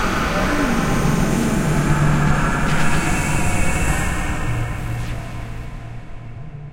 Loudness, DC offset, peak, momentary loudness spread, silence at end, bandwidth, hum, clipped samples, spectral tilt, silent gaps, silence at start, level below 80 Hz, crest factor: -20 LUFS; under 0.1%; -2 dBFS; 17 LU; 0 s; 16 kHz; none; under 0.1%; -5.5 dB/octave; none; 0 s; -26 dBFS; 16 dB